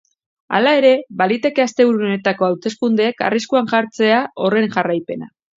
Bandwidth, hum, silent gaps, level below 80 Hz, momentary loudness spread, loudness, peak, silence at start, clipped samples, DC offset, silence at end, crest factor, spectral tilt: 7.8 kHz; none; none; -68 dBFS; 6 LU; -16 LUFS; 0 dBFS; 0.5 s; under 0.1%; under 0.1%; 0.35 s; 16 dB; -5.5 dB/octave